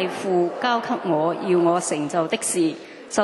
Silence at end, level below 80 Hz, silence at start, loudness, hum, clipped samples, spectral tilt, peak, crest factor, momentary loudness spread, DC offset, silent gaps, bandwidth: 0 s; -76 dBFS; 0 s; -22 LUFS; none; under 0.1%; -4 dB/octave; -6 dBFS; 16 dB; 4 LU; under 0.1%; none; 12 kHz